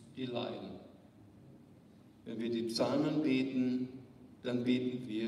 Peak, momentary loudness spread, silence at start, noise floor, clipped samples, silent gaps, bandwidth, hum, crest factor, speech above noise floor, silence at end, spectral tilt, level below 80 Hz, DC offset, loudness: -20 dBFS; 18 LU; 0 s; -60 dBFS; under 0.1%; none; 12.5 kHz; none; 18 dB; 25 dB; 0 s; -6 dB/octave; -76 dBFS; under 0.1%; -36 LUFS